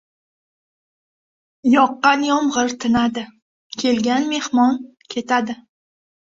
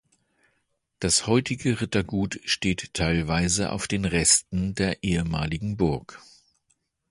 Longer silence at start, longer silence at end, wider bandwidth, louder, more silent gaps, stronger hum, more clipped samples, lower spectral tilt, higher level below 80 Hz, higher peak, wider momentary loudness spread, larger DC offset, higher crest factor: first, 1.65 s vs 1 s; second, 0.6 s vs 0.9 s; second, 7.8 kHz vs 11.5 kHz; first, -18 LUFS vs -24 LUFS; first, 3.42-3.70 s vs none; neither; neither; about the same, -3.5 dB/octave vs -3.5 dB/octave; second, -56 dBFS vs -42 dBFS; first, 0 dBFS vs -6 dBFS; first, 14 LU vs 8 LU; neither; about the same, 20 dB vs 20 dB